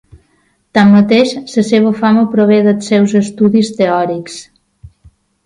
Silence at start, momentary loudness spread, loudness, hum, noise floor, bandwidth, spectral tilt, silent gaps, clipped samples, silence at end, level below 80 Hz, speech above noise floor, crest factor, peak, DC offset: 0.75 s; 9 LU; -11 LUFS; none; -57 dBFS; 10.5 kHz; -6.5 dB/octave; none; under 0.1%; 1.05 s; -50 dBFS; 47 dB; 12 dB; 0 dBFS; under 0.1%